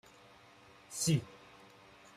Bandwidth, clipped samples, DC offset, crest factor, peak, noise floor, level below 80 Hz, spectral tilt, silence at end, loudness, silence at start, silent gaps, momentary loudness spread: 15 kHz; under 0.1%; under 0.1%; 20 dB; -20 dBFS; -60 dBFS; -70 dBFS; -4.5 dB/octave; 0.8 s; -35 LUFS; 0.9 s; none; 26 LU